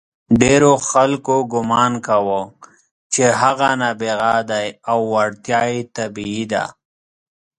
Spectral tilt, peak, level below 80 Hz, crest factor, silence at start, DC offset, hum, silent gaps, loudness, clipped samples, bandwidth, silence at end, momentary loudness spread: -4.5 dB/octave; 0 dBFS; -48 dBFS; 18 dB; 0.3 s; under 0.1%; none; 2.91-3.10 s; -17 LUFS; under 0.1%; 11.5 kHz; 0.9 s; 11 LU